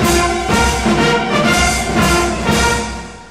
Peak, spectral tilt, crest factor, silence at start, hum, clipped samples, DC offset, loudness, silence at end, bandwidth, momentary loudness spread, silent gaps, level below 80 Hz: -2 dBFS; -4 dB/octave; 12 dB; 0 s; none; under 0.1%; 0.4%; -14 LUFS; 0 s; 16 kHz; 3 LU; none; -24 dBFS